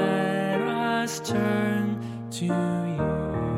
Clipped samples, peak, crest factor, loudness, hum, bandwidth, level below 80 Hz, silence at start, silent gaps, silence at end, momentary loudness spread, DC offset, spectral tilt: under 0.1%; -12 dBFS; 14 dB; -26 LUFS; none; 16 kHz; -48 dBFS; 0 s; none; 0 s; 5 LU; under 0.1%; -6 dB/octave